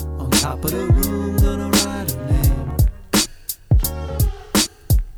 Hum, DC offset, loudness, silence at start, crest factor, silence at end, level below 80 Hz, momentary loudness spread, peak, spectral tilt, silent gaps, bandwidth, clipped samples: none; under 0.1%; -19 LUFS; 0 s; 14 dB; 0 s; -22 dBFS; 5 LU; -4 dBFS; -4.5 dB/octave; none; over 20 kHz; under 0.1%